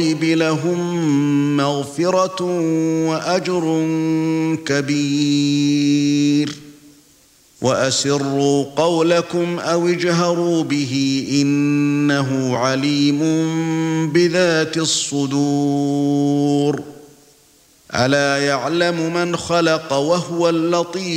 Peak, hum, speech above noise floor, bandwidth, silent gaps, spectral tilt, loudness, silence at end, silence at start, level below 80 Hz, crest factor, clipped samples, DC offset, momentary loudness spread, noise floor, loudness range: -2 dBFS; none; 35 dB; 15 kHz; none; -5 dB/octave; -18 LUFS; 0 s; 0 s; -60 dBFS; 16 dB; under 0.1%; under 0.1%; 4 LU; -52 dBFS; 2 LU